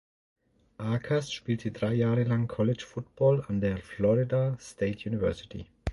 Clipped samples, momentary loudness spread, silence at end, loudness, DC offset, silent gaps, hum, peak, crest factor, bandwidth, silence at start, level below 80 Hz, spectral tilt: under 0.1%; 9 LU; 0 s; -29 LUFS; under 0.1%; none; none; -12 dBFS; 16 dB; 11.5 kHz; 0.8 s; -50 dBFS; -7.5 dB/octave